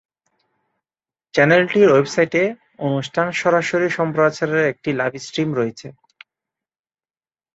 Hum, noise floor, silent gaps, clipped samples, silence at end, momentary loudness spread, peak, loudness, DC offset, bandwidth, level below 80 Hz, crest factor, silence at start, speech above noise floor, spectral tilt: none; under -90 dBFS; none; under 0.1%; 1.65 s; 10 LU; -2 dBFS; -18 LUFS; under 0.1%; 8 kHz; -62 dBFS; 18 dB; 1.35 s; over 72 dB; -5.5 dB/octave